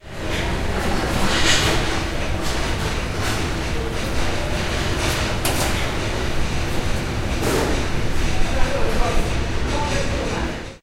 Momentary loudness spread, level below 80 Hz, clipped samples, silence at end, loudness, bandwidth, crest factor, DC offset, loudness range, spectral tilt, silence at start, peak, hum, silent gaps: 5 LU; -26 dBFS; under 0.1%; 0.05 s; -22 LUFS; 16 kHz; 16 dB; under 0.1%; 2 LU; -4 dB/octave; 0.05 s; -4 dBFS; none; none